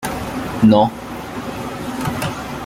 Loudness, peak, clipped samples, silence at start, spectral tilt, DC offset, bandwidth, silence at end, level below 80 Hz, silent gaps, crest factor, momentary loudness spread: -19 LUFS; -2 dBFS; under 0.1%; 0 s; -6 dB/octave; under 0.1%; 17 kHz; 0 s; -42 dBFS; none; 18 dB; 15 LU